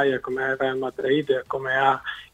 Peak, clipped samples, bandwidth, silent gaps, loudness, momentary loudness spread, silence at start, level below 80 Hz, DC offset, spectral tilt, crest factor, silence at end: -6 dBFS; under 0.1%; 9 kHz; none; -24 LUFS; 5 LU; 0 s; -60 dBFS; under 0.1%; -6 dB/octave; 18 dB; 0.1 s